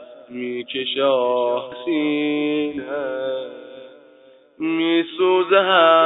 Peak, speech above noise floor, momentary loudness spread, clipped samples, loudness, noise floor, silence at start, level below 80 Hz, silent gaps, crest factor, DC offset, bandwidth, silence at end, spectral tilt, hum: -2 dBFS; 31 dB; 14 LU; under 0.1%; -20 LUFS; -50 dBFS; 0 s; -70 dBFS; none; 18 dB; under 0.1%; 4.1 kHz; 0 s; -9 dB/octave; none